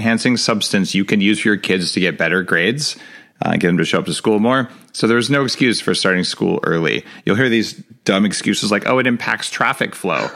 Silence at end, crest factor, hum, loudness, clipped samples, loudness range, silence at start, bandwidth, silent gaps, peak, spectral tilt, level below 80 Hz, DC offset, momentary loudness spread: 0 s; 16 dB; none; -17 LUFS; under 0.1%; 1 LU; 0 s; 15 kHz; none; -2 dBFS; -4.5 dB/octave; -60 dBFS; under 0.1%; 5 LU